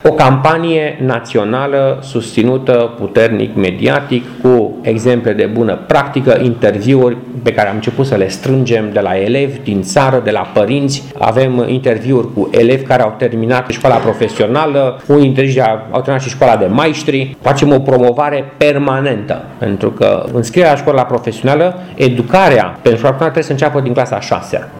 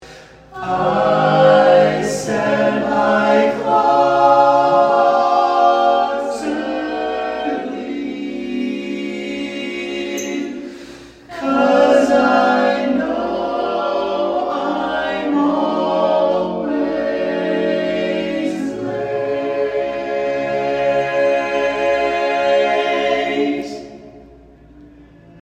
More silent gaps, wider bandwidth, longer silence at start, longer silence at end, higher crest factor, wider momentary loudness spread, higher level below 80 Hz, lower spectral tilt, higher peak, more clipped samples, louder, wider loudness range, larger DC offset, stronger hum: neither; first, 12.5 kHz vs 10 kHz; about the same, 0.05 s vs 0 s; about the same, 0 s vs 0.05 s; about the same, 12 dB vs 16 dB; second, 6 LU vs 12 LU; first, -44 dBFS vs -52 dBFS; about the same, -6.5 dB/octave vs -5.5 dB/octave; about the same, 0 dBFS vs 0 dBFS; neither; first, -12 LUFS vs -17 LUFS; second, 2 LU vs 9 LU; neither; neither